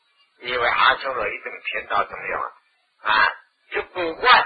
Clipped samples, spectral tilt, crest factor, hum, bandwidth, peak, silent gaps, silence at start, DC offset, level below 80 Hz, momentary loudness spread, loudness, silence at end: under 0.1%; -5.5 dB/octave; 22 dB; none; 4.9 kHz; -2 dBFS; none; 0.4 s; under 0.1%; -54 dBFS; 13 LU; -22 LUFS; 0 s